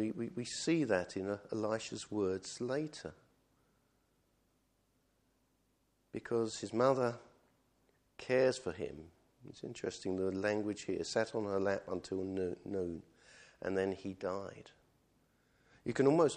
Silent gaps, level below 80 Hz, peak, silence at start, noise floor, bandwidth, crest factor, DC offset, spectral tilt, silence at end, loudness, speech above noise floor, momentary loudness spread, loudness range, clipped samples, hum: none; -72 dBFS; -16 dBFS; 0 s; -77 dBFS; 10.5 kHz; 22 dB; under 0.1%; -5 dB/octave; 0 s; -37 LUFS; 41 dB; 16 LU; 7 LU; under 0.1%; none